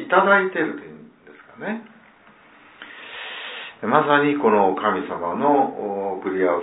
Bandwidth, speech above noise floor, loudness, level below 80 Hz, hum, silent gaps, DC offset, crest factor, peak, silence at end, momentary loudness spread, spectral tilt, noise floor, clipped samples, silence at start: 4 kHz; 31 dB; -20 LUFS; -70 dBFS; none; none; under 0.1%; 20 dB; -2 dBFS; 0 s; 17 LU; -9.5 dB/octave; -51 dBFS; under 0.1%; 0 s